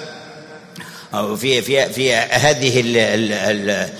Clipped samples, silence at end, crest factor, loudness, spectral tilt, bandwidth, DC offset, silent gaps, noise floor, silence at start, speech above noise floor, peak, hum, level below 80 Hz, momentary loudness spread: under 0.1%; 0 s; 16 dB; -16 LUFS; -3.5 dB/octave; 16 kHz; under 0.1%; none; -38 dBFS; 0 s; 21 dB; -2 dBFS; none; -54 dBFS; 21 LU